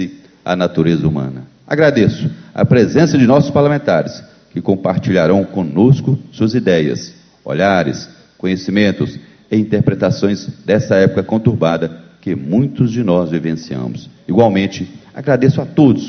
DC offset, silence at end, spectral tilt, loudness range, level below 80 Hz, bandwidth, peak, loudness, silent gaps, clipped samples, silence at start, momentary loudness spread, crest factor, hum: under 0.1%; 0 s; -7.5 dB/octave; 3 LU; -44 dBFS; 6.6 kHz; 0 dBFS; -14 LUFS; none; under 0.1%; 0 s; 14 LU; 14 dB; none